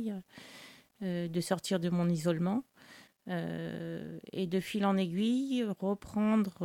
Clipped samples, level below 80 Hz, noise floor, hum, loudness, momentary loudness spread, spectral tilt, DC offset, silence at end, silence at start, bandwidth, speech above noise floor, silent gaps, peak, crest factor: under 0.1%; -70 dBFS; -58 dBFS; none; -33 LUFS; 19 LU; -6.5 dB/octave; under 0.1%; 0 s; 0 s; 16.5 kHz; 25 dB; none; -18 dBFS; 16 dB